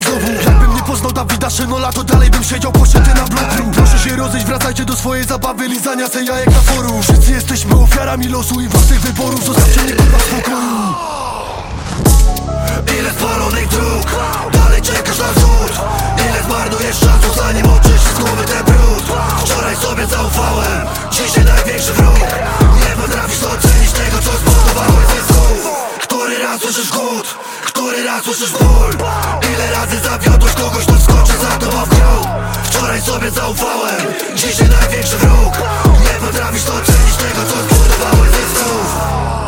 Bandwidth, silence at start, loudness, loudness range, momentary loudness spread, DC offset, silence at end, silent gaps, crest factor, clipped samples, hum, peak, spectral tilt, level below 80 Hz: 17 kHz; 0 s; -12 LUFS; 3 LU; 6 LU; under 0.1%; 0 s; none; 10 dB; under 0.1%; none; 0 dBFS; -4.5 dB/octave; -14 dBFS